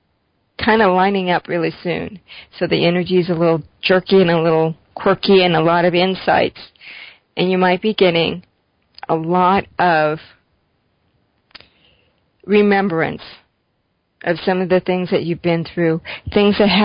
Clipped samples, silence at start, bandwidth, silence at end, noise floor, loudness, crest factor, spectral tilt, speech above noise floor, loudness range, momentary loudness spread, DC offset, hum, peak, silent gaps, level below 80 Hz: under 0.1%; 0.6 s; 5.4 kHz; 0 s; -67 dBFS; -16 LUFS; 16 dB; -11 dB/octave; 51 dB; 6 LU; 15 LU; under 0.1%; none; -2 dBFS; none; -48 dBFS